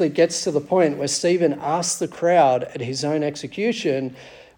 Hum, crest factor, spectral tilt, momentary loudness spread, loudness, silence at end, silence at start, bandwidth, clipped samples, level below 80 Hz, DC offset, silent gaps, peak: none; 16 dB; -4 dB/octave; 9 LU; -21 LUFS; 0.2 s; 0 s; 18 kHz; under 0.1%; -64 dBFS; under 0.1%; none; -4 dBFS